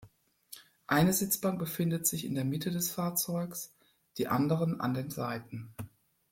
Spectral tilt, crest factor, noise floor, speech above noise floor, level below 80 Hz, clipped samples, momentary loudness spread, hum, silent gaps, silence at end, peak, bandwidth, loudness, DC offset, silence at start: -5 dB/octave; 20 dB; -60 dBFS; 29 dB; -64 dBFS; under 0.1%; 19 LU; none; none; 0.45 s; -14 dBFS; 16.5 kHz; -32 LUFS; under 0.1%; 0 s